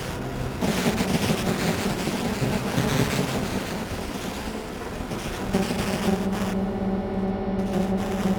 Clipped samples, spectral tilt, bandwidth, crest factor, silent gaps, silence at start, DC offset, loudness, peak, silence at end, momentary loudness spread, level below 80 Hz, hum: under 0.1%; -5.5 dB/octave; over 20 kHz; 18 dB; none; 0 s; under 0.1%; -26 LUFS; -8 dBFS; 0 s; 7 LU; -40 dBFS; none